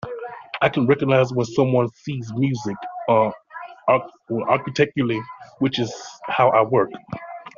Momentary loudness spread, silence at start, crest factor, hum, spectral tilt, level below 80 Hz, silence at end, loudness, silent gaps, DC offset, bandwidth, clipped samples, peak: 16 LU; 0.05 s; 18 dB; none; -5 dB/octave; -60 dBFS; 0.1 s; -21 LUFS; none; under 0.1%; 7.4 kHz; under 0.1%; -2 dBFS